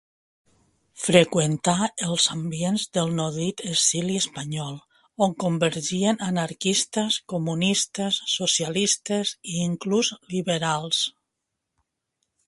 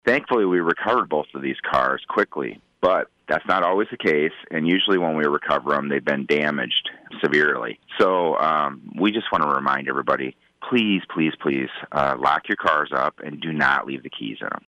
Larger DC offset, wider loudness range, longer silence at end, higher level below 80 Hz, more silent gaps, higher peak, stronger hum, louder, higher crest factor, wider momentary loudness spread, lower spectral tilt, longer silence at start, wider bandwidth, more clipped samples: neither; about the same, 2 LU vs 2 LU; first, 1.4 s vs 0.1 s; second, -64 dBFS vs -58 dBFS; neither; first, 0 dBFS vs -6 dBFS; neither; about the same, -24 LUFS vs -22 LUFS; first, 24 dB vs 16 dB; about the same, 7 LU vs 8 LU; second, -3.5 dB/octave vs -6 dB/octave; first, 0.95 s vs 0.05 s; first, 11.5 kHz vs 9.6 kHz; neither